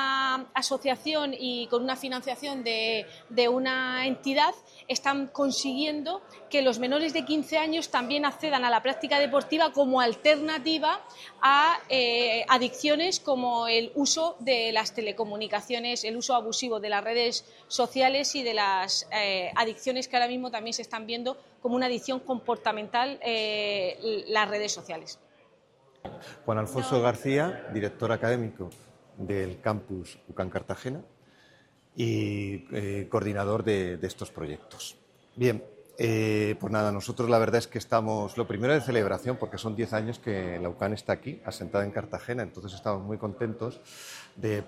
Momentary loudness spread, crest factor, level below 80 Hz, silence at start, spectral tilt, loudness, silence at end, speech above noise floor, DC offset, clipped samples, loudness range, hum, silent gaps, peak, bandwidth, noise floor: 12 LU; 22 dB; -68 dBFS; 0 s; -4 dB/octave; -28 LUFS; 0 s; 33 dB; under 0.1%; under 0.1%; 8 LU; none; none; -6 dBFS; 15 kHz; -62 dBFS